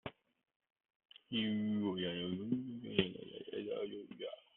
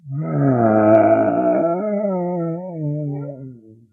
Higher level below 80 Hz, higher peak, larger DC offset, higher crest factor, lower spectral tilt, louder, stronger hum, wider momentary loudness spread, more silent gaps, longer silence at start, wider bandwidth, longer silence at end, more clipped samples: second, -76 dBFS vs -60 dBFS; second, -16 dBFS vs -2 dBFS; neither; first, 26 dB vs 16 dB; second, -4.5 dB/octave vs -12 dB/octave; second, -40 LUFS vs -18 LUFS; neither; second, 11 LU vs 14 LU; first, 0.56-0.60 s, 0.72-0.76 s, 0.96-1.00 s vs none; about the same, 0.05 s vs 0.05 s; first, 4.1 kHz vs 3 kHz; about the same, 0.15 s vs 0.2 s; neither